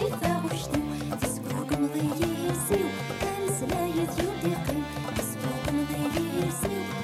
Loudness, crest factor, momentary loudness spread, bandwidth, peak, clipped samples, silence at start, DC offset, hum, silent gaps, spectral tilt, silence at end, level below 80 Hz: -29 LUFS; 18 dB; 4 LU; 16.5 kHz; -12 dBFS; under 0.1%; 0 s; under 0.1%; none; none; -5 dB/octave; 0 s; -46 dBFS